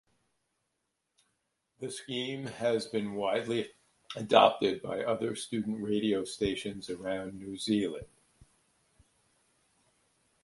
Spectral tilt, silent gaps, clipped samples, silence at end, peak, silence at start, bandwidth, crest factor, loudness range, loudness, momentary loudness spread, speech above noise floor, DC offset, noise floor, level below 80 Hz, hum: -4.5 dB/octave; none; under 0.1%; 2.4 s; -6 dBFS; 1.8 s; 11.5 kHz; 28 dB; 8 LU; -32 LUFS; 15 LU; 51 dB; under 0.1%; -82 dBFS; -64 dBFS; none